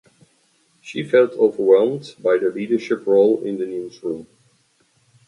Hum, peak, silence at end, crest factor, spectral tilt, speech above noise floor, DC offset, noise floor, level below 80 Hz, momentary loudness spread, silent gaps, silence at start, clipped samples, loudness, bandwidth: none; -2 dBFS; 1.05 s; 18 dB; -6.5 dB/octave; 43 dB; under 0.1%; -62 dBFS; -70 dBFS; 14 LU; none; 0.85 s; under 0.1%; -19 LUFS; 10.5 kHz